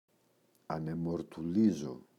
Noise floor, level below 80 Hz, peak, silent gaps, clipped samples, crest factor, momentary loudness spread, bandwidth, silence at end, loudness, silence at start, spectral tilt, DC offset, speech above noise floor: -71 dBFS; -66 dBFS; -18 dBFS; none; under 0.1%; 18 dB; 10 LU; 10.5 kHz; 0.2 s; -34 LUFS; 0.7 s; -8 dB/octave; under 0.1%; 38 dB